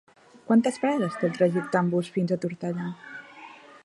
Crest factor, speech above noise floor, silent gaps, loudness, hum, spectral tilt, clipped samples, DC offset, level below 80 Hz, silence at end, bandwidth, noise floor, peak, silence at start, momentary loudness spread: 18 dB; 22 dB; none; -26 LUFS; none; -7 dB/octave; under 0.1%; under 0.1%; -72 dBFS; 0.05 s; 11.5 kHz; -47 dBFS; -8 dBFS; 0.5 s; 19 LU